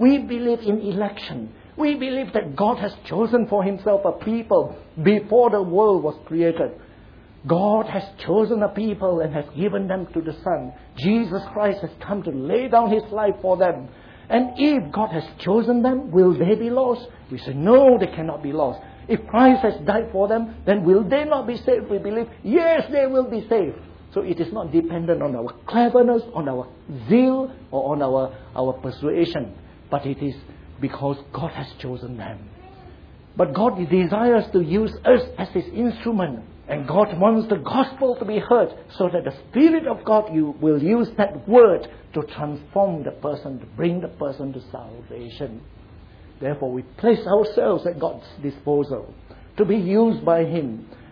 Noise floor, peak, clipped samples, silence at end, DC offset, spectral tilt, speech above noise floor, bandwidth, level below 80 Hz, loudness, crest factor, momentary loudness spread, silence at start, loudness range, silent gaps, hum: -46 dBFS; -2 dBFS; under 0.1%; 0.15 s; under 0.1%; -9.5 dB/octave; 26 dB; 5.4 kHz; -50 dBFS; -21 LUFS; 18 dB; 14 LU; 0 s; 8 LU; none; none